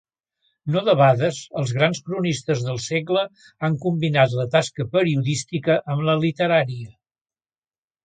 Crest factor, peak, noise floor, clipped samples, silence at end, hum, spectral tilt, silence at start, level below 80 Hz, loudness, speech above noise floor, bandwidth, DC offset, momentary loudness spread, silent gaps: 18 dB; -4 dBFS; under -90 dBFS; under 0.1%; 1.15 s; none; -5.5 dB/octave; 0.65 s; -62 dBFS; -21 LUFS; over 69 dB; 9.4 kHz; under 0.1%; 9 LU; none